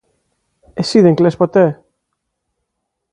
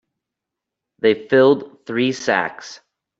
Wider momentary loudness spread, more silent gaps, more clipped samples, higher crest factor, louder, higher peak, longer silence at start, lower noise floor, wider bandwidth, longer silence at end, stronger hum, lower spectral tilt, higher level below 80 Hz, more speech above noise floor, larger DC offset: first, 17 LU vs 14 LU; neither; neither; about the same, 16 dB vs 18 dB; first, -13 LUFS vs -18 LUFS; about the same, 0 dBFS vs -2 dBFS; second, 0.75 s vs 1.05 s; second, -75 dBFS vs -84 dBFS; first, 10.5 kHz vs 7.8 kHz; first, 1.4 s vs 0.45 s; neither; first, -7 dB/octave vs -5 dB/octave; first, -56 dBFS vs -64 dBFS; about the same, 63 dB vs 66 dB; neither